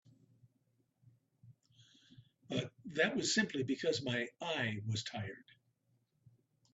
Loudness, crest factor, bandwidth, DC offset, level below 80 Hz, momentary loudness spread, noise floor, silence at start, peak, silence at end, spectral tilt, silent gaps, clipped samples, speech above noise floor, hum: -37 LUFS; 24 dB; 8.2 kHz; under 0.1%; -78 dBFS; 10 LU; -78 dBFS; 1.45 s; -18 dBFS; 1.3 s; -4 dB/octave; none; under 0.1%; 41 dB; none